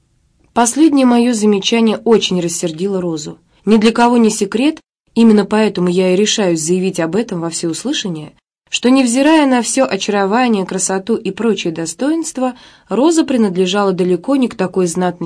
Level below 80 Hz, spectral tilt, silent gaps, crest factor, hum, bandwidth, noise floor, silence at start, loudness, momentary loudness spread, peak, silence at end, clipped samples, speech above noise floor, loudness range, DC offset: -54 dBFS; -4.5 dB/octave; none; 12 dB; none; 11 kHz; -56 dBFS; 0.55 s; -14 LUFS; 9 LU; 0 dBFS; 0 s; under 0.1%; 42 dB; 3 LU; under 0.1%